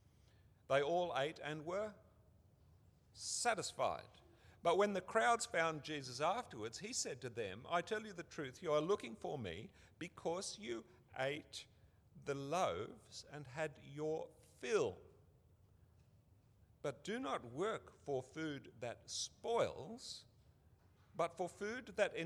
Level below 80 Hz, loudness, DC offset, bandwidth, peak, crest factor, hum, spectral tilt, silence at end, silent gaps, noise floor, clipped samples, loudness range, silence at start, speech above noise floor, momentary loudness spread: -76 dBFS; -42 LUFS; under 0.1%; 19.5 kHz; -22 dBFS; 22 dB; none; -3.5 dB/octave; 0 s; none; -70 dBFS; under 0.1%; 7 LU; 0.7 s; 28 dB; 14 LU